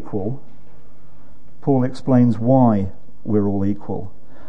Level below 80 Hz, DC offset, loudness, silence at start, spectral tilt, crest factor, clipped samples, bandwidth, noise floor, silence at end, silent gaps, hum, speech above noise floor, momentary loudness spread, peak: -54 dBFS; 7%; -19 LUFS; 0 s; -10.5 dB/octave; 16 dB; under 0.1%; 8.6 kHz; -50 dBFS; 0.4 s; none; none; 32 dB; 15 LU; -2 dBFS